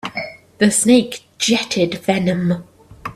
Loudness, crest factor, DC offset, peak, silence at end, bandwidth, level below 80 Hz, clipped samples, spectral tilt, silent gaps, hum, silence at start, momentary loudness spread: -17 LUFS; 18 dB; under 0.1%; 0 dBFS; 0.05 s; 15 kHz; -54 dBFS; under 0.1%; -4 dB/octave; none; none; 0.05 s; 15 LU